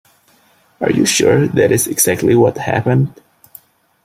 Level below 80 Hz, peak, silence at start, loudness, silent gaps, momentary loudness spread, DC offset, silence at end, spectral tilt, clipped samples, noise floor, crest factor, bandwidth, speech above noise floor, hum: -50 dBFS; 0 dBFS; 0.8 s; -14 LUFS; none; 6 LU; under 0.1%; 0.95 s; -4.5 dB/octave; under 0.1%; -53 dBFS; 16 dB; 16 kHz; 40 dB; none